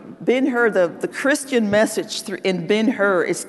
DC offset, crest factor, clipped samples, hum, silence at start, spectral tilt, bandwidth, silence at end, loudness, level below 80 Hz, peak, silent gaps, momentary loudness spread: under 0.1%; 14 dB; under 0.1%; none; 0 s; -4.5 dB/octave; 12.5 kHz; 0 s; -19 LUFS; -64 dBFS; -4 dBFS; none; 6 LU